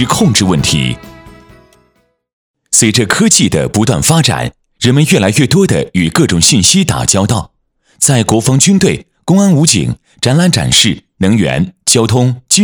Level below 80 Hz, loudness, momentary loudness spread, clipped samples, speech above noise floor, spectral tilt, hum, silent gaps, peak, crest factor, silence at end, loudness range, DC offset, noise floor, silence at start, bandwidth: -36 dBFS; -10 LUFS; 7 LU; 0.6%; 47 dB; -4 dB/octave; none; 2.33-2.54 s; 0 dBFS; 10 dB; 0 s; 3 LU; under 0.1%; -57 dBFS; 0 s; over 20 kHz